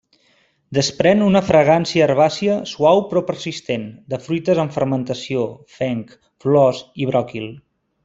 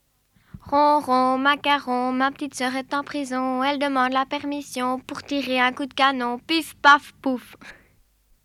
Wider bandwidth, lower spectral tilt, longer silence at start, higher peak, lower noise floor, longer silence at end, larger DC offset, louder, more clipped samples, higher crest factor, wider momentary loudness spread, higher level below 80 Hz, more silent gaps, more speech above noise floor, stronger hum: second, 7.8 kHz vs 15 kHz; first, -6 dB/octave vs -3 dB/octave; first, 0.7 s vs 0.55 s; about the same, -2 dBFS vs -4 dBFS; about the same, -60 dBFS vs -62 dBFS; second, 0.45 s vs 0.7 s; neither; first, -18 LUFS vs -22 LUFS; neither; about the same, 16 dB vs 20 dB; first, 13 LU vs 10 LU; about the same, -56 dBFS vs -60 dBFS; neither; about the same, 42 dB vs 40 dB; neither